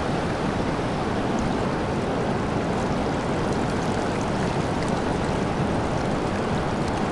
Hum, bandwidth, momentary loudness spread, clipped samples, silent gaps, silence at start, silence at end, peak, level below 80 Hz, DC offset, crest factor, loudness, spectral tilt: none; 11.5 kHz; 1 LU; under 0.1%; none; 0 s; 0 s; -10 dBFS; -38 dBFS; under 0.1%; 14 dB; -25 LUFS; -6 dB/octave